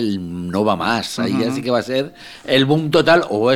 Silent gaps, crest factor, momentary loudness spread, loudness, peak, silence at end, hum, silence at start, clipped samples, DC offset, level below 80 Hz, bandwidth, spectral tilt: none; 16 dB; 10 LU; -17 LUFS; 0 dBFS; 0 s; none; 0 s; under 0.1%; under 0.1%; -54 dBFS; 16.5 kHz; -5.5 dB/octave